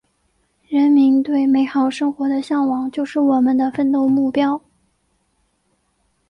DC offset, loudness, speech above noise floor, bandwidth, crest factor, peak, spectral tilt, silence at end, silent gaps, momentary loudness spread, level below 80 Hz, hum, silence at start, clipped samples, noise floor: under 0.1%; -17 LUFS; 49 dB; 9 kHz; 12 dB; -6 dBFS; -6 dB/octave; 1.7 s; none; 8 LU; -62 dBFS; none; 0.7 s; under 0.1%; -66 dBFS